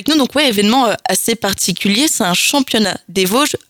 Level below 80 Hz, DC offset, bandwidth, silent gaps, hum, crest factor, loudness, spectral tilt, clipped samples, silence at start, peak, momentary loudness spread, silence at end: -50 dBFS; under 0.1%; over 20 kHz; none; none; 14 dB; -13 LUFS; -3 dB/octave; under 0.1%; 0 s; 0 dBFS; 4 LU; 0.1 s